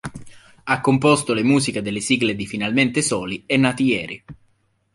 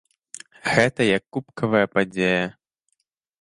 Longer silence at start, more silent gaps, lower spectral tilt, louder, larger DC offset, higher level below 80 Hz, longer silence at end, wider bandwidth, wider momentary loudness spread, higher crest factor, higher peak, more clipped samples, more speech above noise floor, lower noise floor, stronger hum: second, 0.05 s vs 0.65 s; neither; about the same, -4.5 dB/octave vs -5 dB/octave; first, -19 LUFS vs -22 LUFS; neither; first, -52 dBFS vs -58 dBFS; second, 0.6 s vs 0.9 s; about the same, 11.5 kHz vs 11.5 kHz; second, 9 LU vs 18 LU; about the same, 18 dB vs 22 dB; about the same, -2 dBFS vs -2 dBFS; neither; second, 44 dB vs 53 dB; second, -63 dBFS vs -75 dBFS; neither